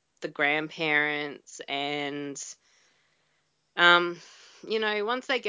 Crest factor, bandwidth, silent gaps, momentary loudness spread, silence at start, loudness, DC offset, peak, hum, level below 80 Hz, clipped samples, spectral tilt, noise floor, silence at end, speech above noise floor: 24 dB; 8 kHz; none; 19 LU; 0.2 s; -26 LUFS; under 0.1%; -4 dBFS; none; -84 dBFS; under 0.1%; -3 dB/octave; -73 dBFS; 0 s; 46 dB